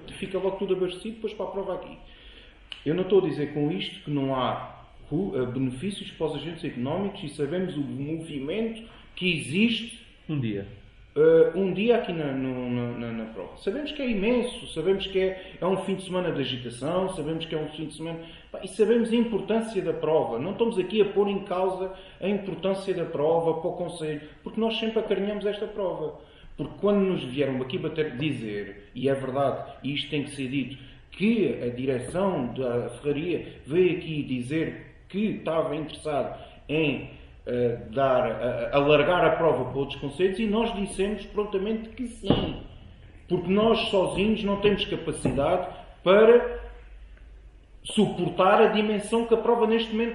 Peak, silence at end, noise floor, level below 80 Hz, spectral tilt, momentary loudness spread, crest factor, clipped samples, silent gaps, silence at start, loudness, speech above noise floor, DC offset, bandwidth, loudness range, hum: -6 dBFS; 0 s; -49 dBFS; -50 dBFS; -6 dB/octave; 12 LU; 22 dB; under 0.1%; none; 0 s; -26 LUFS; 23 dB; under 0.1%; 11.5 kHz; 6 LU; none